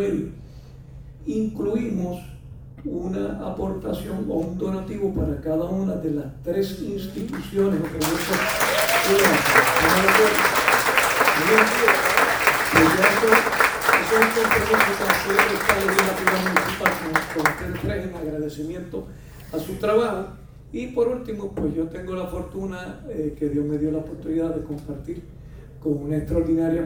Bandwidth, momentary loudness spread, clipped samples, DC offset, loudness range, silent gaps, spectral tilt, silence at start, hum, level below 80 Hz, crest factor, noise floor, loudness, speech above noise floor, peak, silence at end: over 20 kHz; 15 LU; under 0.1%; under 0.1%; 11 LU; none; -4 dB/octave; 0 s; none; -42 dBFS; 22 dB; -42 dBFS; -21 LUFS; 19 dB; 0 dBFS; 0 s